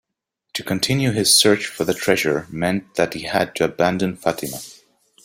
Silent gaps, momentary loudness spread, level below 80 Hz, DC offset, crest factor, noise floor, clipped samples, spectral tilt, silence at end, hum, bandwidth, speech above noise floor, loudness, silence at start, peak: none; 15 LU; -54 dBFS; under 0.1%; 18 dB; -78 dBFS; under 0.1%; -3.5 dB/octave; 0.5 s; none; 16.5 kHz; 58 dB; -19 LUFS; 0.55 s; -2 dBFS